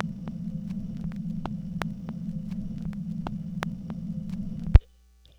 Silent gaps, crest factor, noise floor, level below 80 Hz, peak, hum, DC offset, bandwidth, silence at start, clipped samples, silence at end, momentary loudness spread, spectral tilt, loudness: none; 28 dB; -57 dBFS; -32 dBFS; 0 dBFS; none; under 0.1%; 10.5 kHz; 0 s; under 0.1%; 0.6 s; 13 LU; -8.5 dB/octave; -31 LUFS